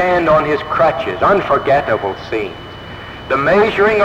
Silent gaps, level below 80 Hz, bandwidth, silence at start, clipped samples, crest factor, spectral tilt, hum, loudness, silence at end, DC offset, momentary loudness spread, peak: none; -40 dBFS; 8.8 kHz; 0 s; under 0.1%; 12 dB; -6.5 dB/octave; none; -14 LUFS; 0 s; under 0.1%; 18 LU; -4 dBFS